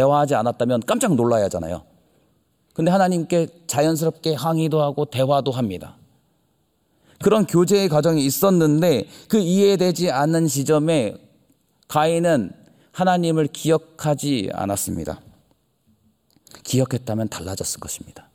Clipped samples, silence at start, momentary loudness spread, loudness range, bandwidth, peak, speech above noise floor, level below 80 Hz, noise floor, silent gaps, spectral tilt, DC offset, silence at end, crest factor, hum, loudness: under 0.1%; 0 s; 11 LU; 8 LU; 17 kHz; -4 dBFS; 46 dB; -58 dBFS; -66 dBFS; none; -5.5 dB/octave; under 0.1%; 0.15 s; 16 dB; none; -20 LUFS